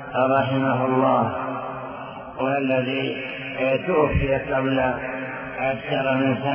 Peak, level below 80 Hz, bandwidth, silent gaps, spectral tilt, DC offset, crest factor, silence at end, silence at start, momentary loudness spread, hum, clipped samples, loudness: -6 dBFS; -42 dBFS; 5.4 kHz; none; -10.5 dB/octave; under 0.1%; 16 dB; 0 s; 0 s; 10 LU; none; under 0.1%; -23 LUFS